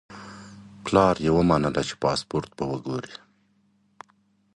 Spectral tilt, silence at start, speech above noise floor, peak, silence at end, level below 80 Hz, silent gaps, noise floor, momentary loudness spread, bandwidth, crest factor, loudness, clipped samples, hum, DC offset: -6 dB/octave; 0.1 s; 42 dB; -2 dBFS; 1.4 s; -48 dBFS; none; -65 dBFS; 22 LU; 11.5 kHz; 24 dB; -24 LUFS; under 0.1%; none; under 0.1%